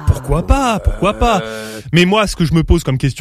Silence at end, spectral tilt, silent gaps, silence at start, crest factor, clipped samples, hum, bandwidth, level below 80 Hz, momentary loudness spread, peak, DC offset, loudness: 0 s; -6 dB/octave; none; 0 s; 14 dB; under 0.1%; none; 14.5 kHz; -20 dBFS; 6 LU; 0 dBFS; under 0.1%; -14 LUFS